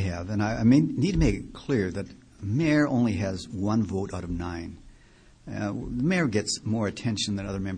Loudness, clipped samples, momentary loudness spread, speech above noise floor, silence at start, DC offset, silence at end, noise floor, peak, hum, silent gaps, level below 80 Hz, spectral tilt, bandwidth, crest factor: -27 LUFS; under 0.1%; 12 LU; 29 dB; 0 s; under 0.1%; 0 s; -55 dBFS; -8 dBFS; none; none; -42 dBFS; -6 dB/octave; 10 kHz; 18 dB